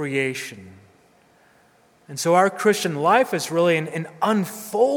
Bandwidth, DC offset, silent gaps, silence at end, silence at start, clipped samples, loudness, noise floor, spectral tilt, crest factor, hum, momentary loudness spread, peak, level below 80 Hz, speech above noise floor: over 20 kHz; under 0.1%; none; 0 s; 0 s; under 0.1%; -21 LUFS; -57 dBFS; -4.5 dB/octave; 20 dB; none; 11 LU; -4 dBFS; -72 dBFS; 36 dB